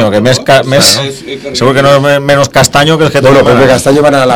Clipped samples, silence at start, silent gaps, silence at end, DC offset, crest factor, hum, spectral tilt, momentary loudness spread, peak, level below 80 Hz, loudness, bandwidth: 10%; 0 s; none; 0 s; under 0.1%; 6 dB; none; -4 dB/octave; 6 LU; 0 dBFS; -36 dBFS; -6 LUFS; over 20 kHz